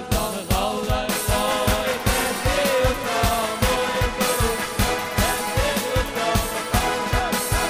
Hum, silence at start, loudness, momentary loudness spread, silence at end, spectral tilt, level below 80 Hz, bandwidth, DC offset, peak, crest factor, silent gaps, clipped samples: none; 0 s; -22 LUFS; 3 LU; 0 s; -3.5 dB/octave; -30 dBFS; 16.5 kHz; under 0.1%; -6 dBFS; 16 dB; none; under 0.1%